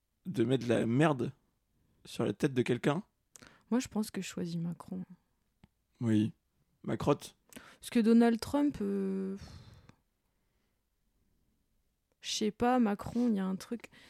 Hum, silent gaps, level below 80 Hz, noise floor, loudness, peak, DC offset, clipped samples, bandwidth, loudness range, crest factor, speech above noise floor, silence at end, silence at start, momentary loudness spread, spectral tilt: none; none; -64 dBFS; -78 dBFS; -32 LUFS; -14 dBFS; under 0.1%; under 0.1%; 15 kHz; 8 LU; 20 dB; 47 dB; 0.3 s; 0.25 s; 16 LU; -6 dB/octave